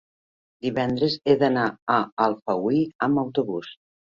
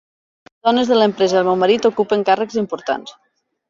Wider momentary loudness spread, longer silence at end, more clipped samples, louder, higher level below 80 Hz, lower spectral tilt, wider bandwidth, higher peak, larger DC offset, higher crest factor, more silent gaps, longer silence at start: about the same, 9 LU vs 8 LU; second, 0.45 s vs 0.6 s; neither; second, -24 LUFS vs -17 LUFS; about the same, -62 dBFS vs -62 dBFS; first, -7.5 dB/octave vs -5 dB/octave; about the same, 7.4 kHz vs 7.6 kHz; second, -6 dBFS vs -2 dBFS; neither; about the same, 18 dB vs 16 dB; first, 1.82-1.87 s, 2.12-2.17 s, 2.95-2.99 s vs none; about the same, 0.65 s vs 0.65 s